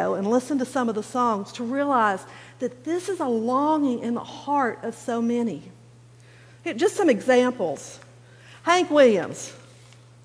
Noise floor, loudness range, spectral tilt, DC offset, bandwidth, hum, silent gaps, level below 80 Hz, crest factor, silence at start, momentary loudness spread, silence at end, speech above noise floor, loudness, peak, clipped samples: -50 dBFS; 4 LU; -4.5 dB/octave; under 0.1%; 11 kHz; none; none; -70 dBFS; 18 dB; 0 s; 14 LU; 0.65 s; 27 dB; -23 LUFS; -6 dBFS; under 0.1%